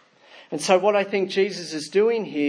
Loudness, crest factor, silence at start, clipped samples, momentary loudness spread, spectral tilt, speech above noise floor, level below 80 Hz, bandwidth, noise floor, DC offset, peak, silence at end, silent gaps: -22 LUFS; 18 dB; 0.35 s; under 0.1%; 10 LU; -4 dB/octave; 29 dB; -80 dBFS; 10.5 kHz; -50 dBFS; under 0.1%; -4 dBFS; 0 s; none